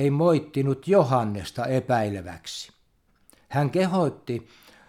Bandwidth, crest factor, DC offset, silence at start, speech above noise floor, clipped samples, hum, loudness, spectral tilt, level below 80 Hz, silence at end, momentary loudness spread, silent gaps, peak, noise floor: 14.5 kHz; 20 dB; under 0.1%; 0 s; 40 dB; under 0.1%; none; -25 LUFS; -7 dB/octave; -60 dBFS; 0.45 s; 15 LU; none; -6 dBFS; -64 dBFS